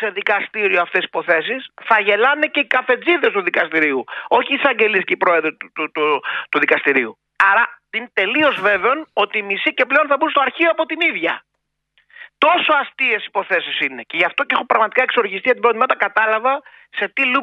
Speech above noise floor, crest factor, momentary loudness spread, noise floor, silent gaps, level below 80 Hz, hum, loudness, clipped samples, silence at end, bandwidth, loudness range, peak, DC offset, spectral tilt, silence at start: 47 dB; 18 dB; 6 LU; -65 dBFS; none; -68 dBFS; none; -17 LUFS; under 0.1%; 0 s; 8.2 kHz; 2 LU; 0 dBFS; under 0.1%; -5 dB/octave; 0 s